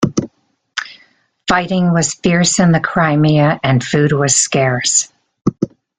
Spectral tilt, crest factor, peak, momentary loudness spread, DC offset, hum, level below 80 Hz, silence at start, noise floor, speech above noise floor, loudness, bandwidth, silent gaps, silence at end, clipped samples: -4.5 dB/octave; 14 dB; 0 dBFS; 13 LU; under 0.1%; none; -46 dBFS; 0 s; -58 dBFS; 45 dB; -14 LUFS; 9.6 kHz; none; 0.3 s; under 0.1%